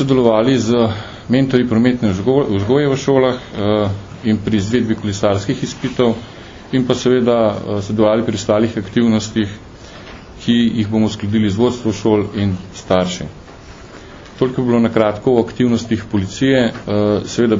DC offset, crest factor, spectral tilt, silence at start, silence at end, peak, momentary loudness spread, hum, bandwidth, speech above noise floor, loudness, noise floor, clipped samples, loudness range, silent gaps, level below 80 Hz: under 0.1%; 16 dB; -6.5 dB/octave; 0 s; 0 s; 0 dBFS; 12 LU; none; 7.6 kHz; 21 dB; -16 LUFS; -36 dBFS; under 0.1%; 3 LU; none; -42 dBFS